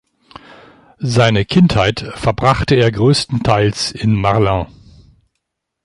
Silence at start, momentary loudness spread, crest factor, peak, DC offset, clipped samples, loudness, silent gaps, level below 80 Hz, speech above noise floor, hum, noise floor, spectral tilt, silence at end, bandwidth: 1 s; 7 LU; 14 dB; 0 dBFS; under 0.1%; under 0.1%; -14 LUFS; none; -36 dBFS; 61 dB; none; -74 dBFS; -6 dB/octave; 1.2 s; 11.5 kHz